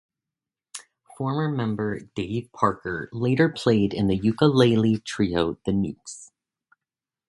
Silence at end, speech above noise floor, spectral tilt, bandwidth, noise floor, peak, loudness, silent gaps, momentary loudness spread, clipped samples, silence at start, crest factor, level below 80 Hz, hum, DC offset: 1.05 s; 67 dB; -6.5 dB/octave; 11.5 kHz; -90 dBFS; -2 dBFS; -24 LUFS; none; 20 LU; under 0.1%; 0.75 s; 22 dB; -52 dBFS; none; under 0.1%